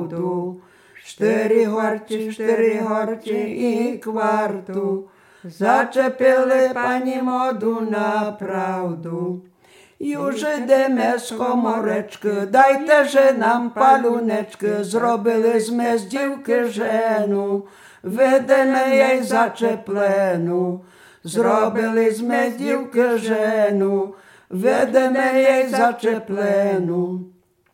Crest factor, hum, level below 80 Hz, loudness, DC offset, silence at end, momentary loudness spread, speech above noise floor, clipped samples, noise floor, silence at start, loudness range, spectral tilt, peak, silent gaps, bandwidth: 18 dB; none; -72 dBFS; -19 LUFS; under 0.1%; 0.45 s; 10 LU; 28 dB; under 0.1%; -46 dBFS; 0 s; 5 LU; -5.5 dB/octave; 0 dBFS; none; 17 kHz